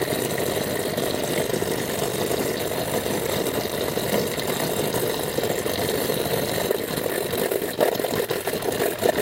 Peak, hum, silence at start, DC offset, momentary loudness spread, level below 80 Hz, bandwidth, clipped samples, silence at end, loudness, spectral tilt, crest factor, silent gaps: -4 dBFS; none; 0 s; under 0.1%; 2 LU; -50 dBFS; 17 kHz; under 0.1%; 0 s; -24 LUFS; -3.5 dB/octave; 20 dB; none